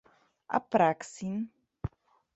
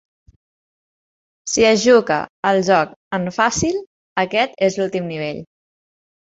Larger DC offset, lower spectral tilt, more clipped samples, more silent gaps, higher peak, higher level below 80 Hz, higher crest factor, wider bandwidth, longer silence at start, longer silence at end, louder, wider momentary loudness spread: neither; first, -6.5 dB/octave vs -4 dB/octave; neither; second, none vs 2.30-2.43 s, 2.96-3.11 s, 3.87-4.16 s; second, -10 dBFS vs -2 dBFS; about the same, -56 dBFS vs -52 dBFS; about the same, 22 dB vs 18 dB; about the same, 8.4 kHz vs 8.2 kHz; second, 0.5 s vs 1.45 s; second, 0.5 s vs 0.9 s; second, -30 LUFS vs -18 LUFS; first, 16 LU vs 13 LU